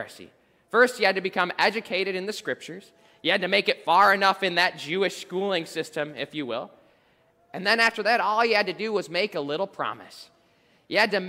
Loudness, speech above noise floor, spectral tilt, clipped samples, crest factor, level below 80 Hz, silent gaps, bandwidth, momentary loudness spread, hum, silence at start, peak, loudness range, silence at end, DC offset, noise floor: -24 LUFS; 38 dB; -3.5 dB/octave; under 0.1%; 20 dB; -72 dBFS; none; 16 kHz; 12 LU; none; 0 s; -6 dBFS; 4 LU; 0 s; under 0.1%; -63 dBFS